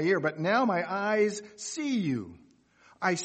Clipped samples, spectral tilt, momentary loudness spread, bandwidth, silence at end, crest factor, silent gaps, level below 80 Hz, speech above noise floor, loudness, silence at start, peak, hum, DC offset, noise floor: under 0.1%; -5 dB/octave; 11 LU; 8.8 kHz; 0 s; 18 dB; none; -72 dBFS; 33 dB; -29 LUFS; 0 s; -12 dBFS; none; under 0.1%; -61 dBFS